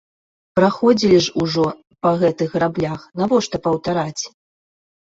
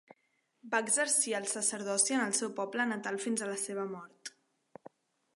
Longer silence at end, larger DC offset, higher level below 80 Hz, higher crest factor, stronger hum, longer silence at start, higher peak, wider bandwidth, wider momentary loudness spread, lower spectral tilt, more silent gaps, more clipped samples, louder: second, 0.8 s vs 1.05 s; neither; first, -52 dBFS vs -88 dBFS; about the same, 16 dB vs 20 dB; neither; about the same, 0.55 s vs 0.65 s; first, -2 dBFS vs -14 dBFS; second, 8 kHz vs 12 kHz; second, 9 LU vs 14 LU; first, -5.5 dB/octave vs -1.5 dB/octave; neither; neither; first, -19 LUFS vs -31 LUFS